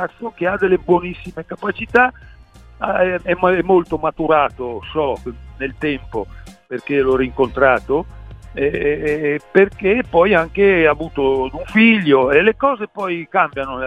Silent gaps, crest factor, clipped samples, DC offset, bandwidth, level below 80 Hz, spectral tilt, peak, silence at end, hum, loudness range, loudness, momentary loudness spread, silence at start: none; 18 dB; under 0.1%; under 0.1%; 8.4 kHz; -40 dBFS; -7.5 dB/octave; 0 dBFS; 0 s; none; 6 LU; -16 LUFS; 14 LU; 0 s